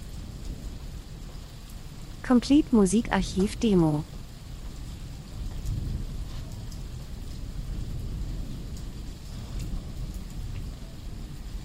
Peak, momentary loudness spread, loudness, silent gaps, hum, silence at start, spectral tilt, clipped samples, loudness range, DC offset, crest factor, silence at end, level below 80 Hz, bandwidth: -8 dBFS; 20 LU; -29 LUFS; none; none; 0 s; -6 dB/octave; under 0.1%; 13 LU; under 0.1%; 22 dB; 0 s; -38 dBFS; 16 kHz